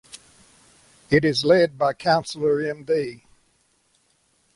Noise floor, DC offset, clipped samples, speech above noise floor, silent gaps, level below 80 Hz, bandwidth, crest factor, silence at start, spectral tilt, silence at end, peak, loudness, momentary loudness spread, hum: -65 dBFS; under 0.1%; under 0.1%; 44 dB; none; -58 dBFS; 11.5 kHz; 18 dB; 0.15 s; -5.5 dB/octave; 1.4 s; -6 dBFS; -21 LUFS; 7 LU; none